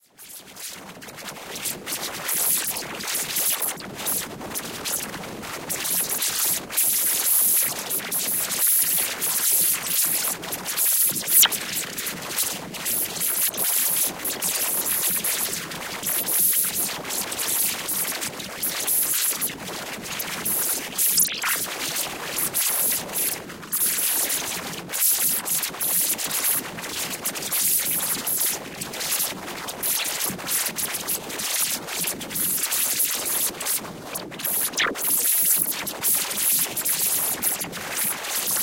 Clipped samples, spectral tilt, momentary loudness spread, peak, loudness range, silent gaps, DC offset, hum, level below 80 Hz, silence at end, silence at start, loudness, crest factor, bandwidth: under 0.1%; 0 dB/octave; 11 LU; -2 dBFS; 5 LU; none; under 0.1%; none; -60 dBFS; 0 s; 0.2 s; -22 LUFS; 22 dB; 17 kHz